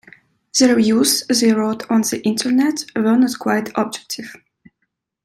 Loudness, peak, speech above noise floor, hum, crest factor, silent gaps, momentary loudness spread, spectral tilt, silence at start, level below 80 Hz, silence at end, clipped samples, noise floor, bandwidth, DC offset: -17 LUFS; -2 dBFS; 56 dB; none; 16 dB; none; 10 LU; -3.5 dB/octave; 0.55 s; -62 dBFS; 0.9 s; under 0.1%; -73 dBFS; 15.5 kHz; under 0.1%